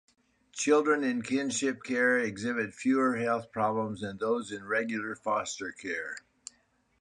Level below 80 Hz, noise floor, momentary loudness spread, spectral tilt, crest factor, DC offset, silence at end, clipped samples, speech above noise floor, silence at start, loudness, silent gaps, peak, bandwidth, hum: -70 dBFS; -70 dBFS; 11 LU; -4 dB/octave; 18 dB; under 0.1%; 0.8 s; under 0.1%; 40 dB; 0.55 s; -30 LUFS; none; -12 dBFS; 11 kHz; none